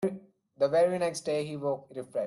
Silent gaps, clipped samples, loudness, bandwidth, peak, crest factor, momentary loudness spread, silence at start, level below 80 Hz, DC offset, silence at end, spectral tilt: none; under 0.1%; -30 LUFS; 12.5 kHz; -14 dBFS; 16 dB; 11 LU; 0 s; -74 dBFS; under 0.1%; 0 s; -5.5 dB/octave